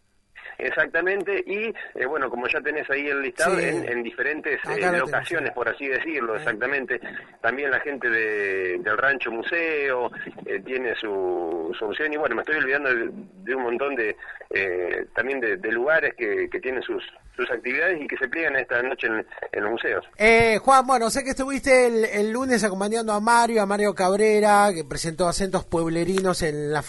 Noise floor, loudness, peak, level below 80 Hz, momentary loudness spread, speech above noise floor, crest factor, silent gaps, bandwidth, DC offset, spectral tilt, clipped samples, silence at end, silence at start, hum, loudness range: -46 dBFS; -23 LUFS; -2 dBFS; -50 dBFS; 11 LU; 22 dB; 22 dB; none; 11.5 kHz; under 0.1%; -4 dB/octave; under 0.1%; 0 s; 0.35 s; none; 5 LU